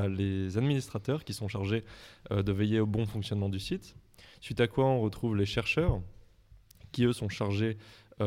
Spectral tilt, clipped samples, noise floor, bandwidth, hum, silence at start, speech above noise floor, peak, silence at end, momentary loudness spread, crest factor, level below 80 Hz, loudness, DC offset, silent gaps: -7 dB/octave; under 0.1%; -58 dBFS; 15 kHz; none; 0 s; 28 dB; -14 dBFS; 0 s; 11 LU; 18 dB; -48 dBFS; -31 LUFS; under 0.1%; none